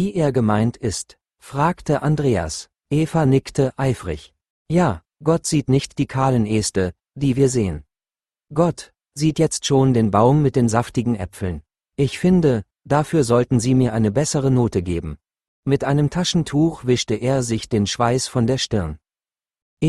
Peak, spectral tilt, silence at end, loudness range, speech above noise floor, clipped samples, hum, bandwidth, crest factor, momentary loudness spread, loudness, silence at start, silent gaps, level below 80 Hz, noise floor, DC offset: -2 dBFS; -6 dB/octave; 0 s; 3 LU; over 71 dB; under 0.1%; none; 12.5 kHz; 18 dB; 10 LU; -20 LUFS; 0 s; 4.50-4.65 s, 15.48-15.63 s, 19.62-19.77 s; -44 dBFS; under -90 dBFS; under 0.1%